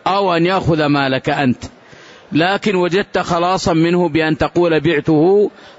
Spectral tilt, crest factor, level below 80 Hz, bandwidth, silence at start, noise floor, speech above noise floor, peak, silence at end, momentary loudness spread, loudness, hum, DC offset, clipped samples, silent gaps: -6 dB/octave; 12 dB; -42 dBFS; 8 kHz; 0.05 s; -41 dBFS; 26 dB; -4 dBFS; 0.1 s; 4 LU; -15 LUFS; none; under 0.1%; under 0.1%; none